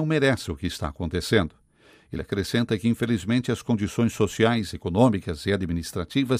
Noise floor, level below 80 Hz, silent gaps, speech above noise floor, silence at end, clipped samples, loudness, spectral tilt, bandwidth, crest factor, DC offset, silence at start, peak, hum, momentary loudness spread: -57 dBFS; -48 dBFS; none; 33 dB; 0 s; under 0.1%; -25 LUFS; -6 dB/octave; 15.5 kHz; 20 dB; under 0.1%; 0 s; -4 dBFS; none; 9 LU